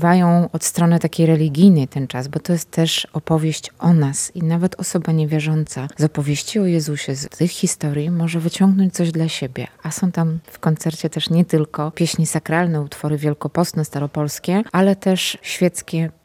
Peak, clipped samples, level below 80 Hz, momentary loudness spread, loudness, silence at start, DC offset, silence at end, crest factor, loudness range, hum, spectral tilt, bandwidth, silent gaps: -2 dBFS; under 0.1%; -56 dBFS; 8 LU; -19 LUFS; 0 s; under 0.1%; 0.15 s; 16 dB; 3 LU; none; -5.5 dB/octave; 15.5 kHz; none